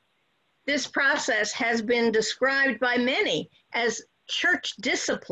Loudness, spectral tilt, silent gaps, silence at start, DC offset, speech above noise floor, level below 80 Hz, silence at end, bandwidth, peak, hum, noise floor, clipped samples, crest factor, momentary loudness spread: -24 LUFS; -2 dB/octave; none; 0.65 s; under 0.1%; 46 dB; -68 dBFS; 0.05 s; 9.2 kHz; -12 dBFS; none; -71 dBFS; under 0.1%; 14 dB; 7 LU